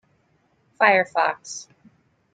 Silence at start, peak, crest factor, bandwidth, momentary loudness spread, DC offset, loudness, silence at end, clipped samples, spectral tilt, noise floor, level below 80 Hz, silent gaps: 0.8 s; -2 dBFS; 22 dB; 9.4 kHz; 18 LU; under 0.1%; -20 LUFS; 0.7 s; under 0.1%; -2.5 dB/octave; -65 dBFS; -76 dBFS; none